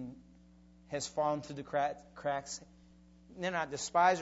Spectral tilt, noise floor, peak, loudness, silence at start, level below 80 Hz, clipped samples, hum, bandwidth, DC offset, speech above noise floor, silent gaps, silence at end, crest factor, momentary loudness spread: -3.5 dB/octave; -60 dBFS; -14 dBFS; -36 LUFS; 0 s; -66 dBFS; under 0.1%; none; 8 kHz; under 0.1%; 26 dB; none; 0 s; 22 dB; 14 LU